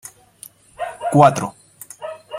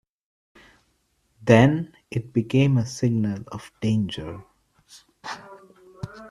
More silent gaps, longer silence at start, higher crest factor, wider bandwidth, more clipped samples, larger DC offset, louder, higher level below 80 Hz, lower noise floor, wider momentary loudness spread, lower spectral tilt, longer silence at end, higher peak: neither; second, 0.8 s vs 1.4 s; second, 18 dB vs 24 dB; first, 16 kHz vs 12 kHz; neither; neither; first, -16 LUFS vs -22 LUFS; about the same, -56 dBFS vs -54 dBFS; second, -45 dBFS vs -68 dBFS; first, 26 LU vs 22 LU; about the same, -6 dB/octave vs -7 dB/octave; about the same, 0 s vs 0 s; about the same, -2 dBFS vs 0 dBFS